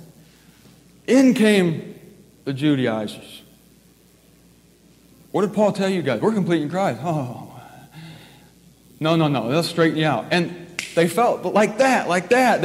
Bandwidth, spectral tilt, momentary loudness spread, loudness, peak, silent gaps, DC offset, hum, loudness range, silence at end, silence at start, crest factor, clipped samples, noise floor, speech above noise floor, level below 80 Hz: 16 kHz; -5.5 dB/octave; 19 LU; -20 LUFS; -4 dBFS; none; under 0.1%; none; 7 LU; 0 s; 0 s; 18 dB; under 0.1%; -53 dBFS; 35 dB; -62 dBFS